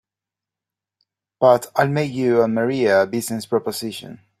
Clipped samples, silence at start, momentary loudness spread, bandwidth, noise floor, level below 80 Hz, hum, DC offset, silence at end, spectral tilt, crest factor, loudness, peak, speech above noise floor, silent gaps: under 0.1%; 1.4 s; 11 LU; 16 kHz; -88 dBFS; -62 dBFS; none; under 0.1%; 0.25 s; -5.5 dB/octave; 18 dB; -19 LUFS; -2 dBFS; 69 dB; none